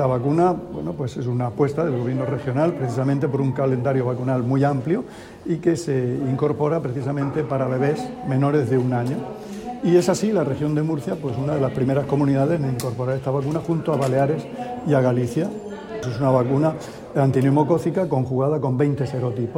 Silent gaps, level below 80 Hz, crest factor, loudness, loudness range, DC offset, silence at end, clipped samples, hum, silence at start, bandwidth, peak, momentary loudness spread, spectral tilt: none; -52 dBFS; 16 dB; -22 LUFS; 2 LU; under 0.1%; 0 s; under 0.1%; none; 0 s; 15 kHz; -4 dBFS; 9 LU; -8 dB/octave